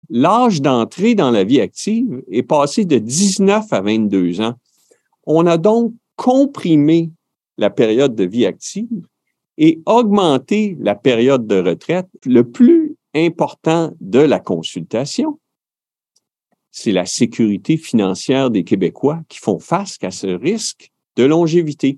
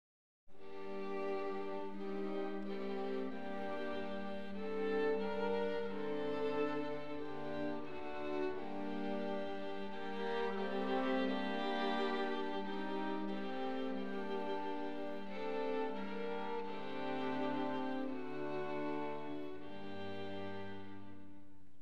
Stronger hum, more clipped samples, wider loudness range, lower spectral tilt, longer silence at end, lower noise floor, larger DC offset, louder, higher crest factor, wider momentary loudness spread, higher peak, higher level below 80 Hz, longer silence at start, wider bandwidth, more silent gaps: neither; neither; about the same, 4 LU vs 4 LU; about the same, -5.5 dB/octave vs -6.5 dB/octave; second, 0 s vs 0.15 s; first, under -90 dBFS vs -62 dBFS; second, under 0.1% vs 0.7%; first, -15 LUFS vs -41 LUFS; about the same, 14 dB vs 16 dB; about the same, 10 LU vs 9 LU; first, 0 dBFS vs -24 dBFS; first, -68 dBFS vs -74 dBFS; second, 0.1 s vs 0.45 s; about the same, 12 kHz vs 11 kHz; neither